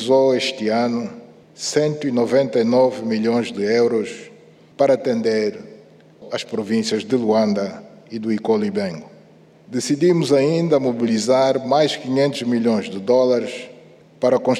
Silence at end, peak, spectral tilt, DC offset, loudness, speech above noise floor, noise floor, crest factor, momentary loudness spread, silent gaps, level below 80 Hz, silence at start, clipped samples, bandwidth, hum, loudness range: 0 s; -4 dBFS; -5.5 dB/octave; under 0.1%; -19 LUFS; 30 dB; -48 dBFS; 16 dB; 12 LU; none; -68 dBFS; 0 s; under 0.1%; 12.5 kHz; none; 4 LU